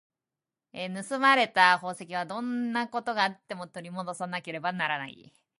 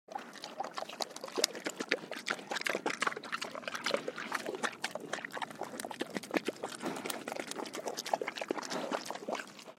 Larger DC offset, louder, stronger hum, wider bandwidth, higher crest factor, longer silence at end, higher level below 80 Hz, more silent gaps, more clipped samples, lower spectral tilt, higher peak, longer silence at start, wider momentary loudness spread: neither; first, -27 LUFS vs -38 LUFS; neither; second, 11.5 kHz vs 16.5 kHz; second, 24 dB vs 36 dB; first, 0.5 s vs 0.05 s; first, -80 dBFS vs -88 dBFS; neither; neither; first, -4 dB/octave vs -2 dB/octave; second, -6 dBFS vs -2 dBFS; first, 0.75 s vs 0.1 s; first, 17 LU vs 7 LU